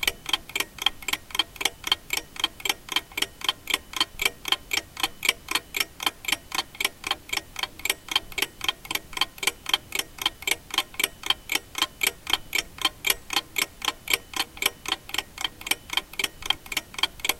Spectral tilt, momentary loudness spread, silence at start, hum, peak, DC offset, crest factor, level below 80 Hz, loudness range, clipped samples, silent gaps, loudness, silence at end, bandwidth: 0.5 dB/octave; 5 LU; 0 s; none; -2 dBFS; under 0.1%; 28 dB; -52 dBFS; 2 LU; under 0.1%; none; -26 LUFS; 0 s; 17 kHz